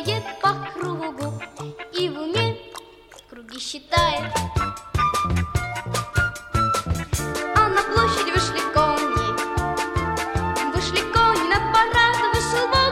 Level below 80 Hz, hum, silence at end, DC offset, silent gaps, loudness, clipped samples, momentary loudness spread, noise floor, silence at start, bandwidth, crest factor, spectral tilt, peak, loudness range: -36 dBFS; 50 Hz at -50 dBFS; 0 s; under 0.1%; none; -22 LUFS; under 0.1%; 12 LU; -46 dBFS; 0 s; 16.5 kHz; 18 dB; -4 dB/octave; -4 dBFS; 6 LU